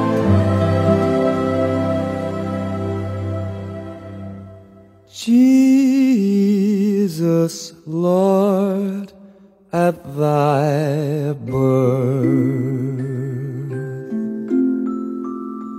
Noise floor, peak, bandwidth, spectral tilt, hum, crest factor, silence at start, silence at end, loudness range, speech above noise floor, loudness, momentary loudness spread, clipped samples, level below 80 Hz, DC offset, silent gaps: -46 dBFS; -2 dBFS; 15 kHz; -8 dB/octave; none; 16 dB; 0 s; 0 s; 7 LU; 28 dB; -18 LUFS; 13 LU; under 0.1%; -54 dBFS; under 0.1%; none